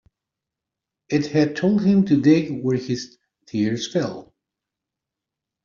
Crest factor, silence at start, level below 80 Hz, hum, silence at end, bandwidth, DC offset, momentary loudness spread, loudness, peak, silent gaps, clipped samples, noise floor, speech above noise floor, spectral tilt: 18 dB; 1.1 s; -62 dBFS; none; 1.4 s; 7.2 kHz; under 0.1%; 13 LU; -21 LUFS; -4 dBFS; none; under 0.1%; -86 dBFS; 66 dB; -7 dB/octave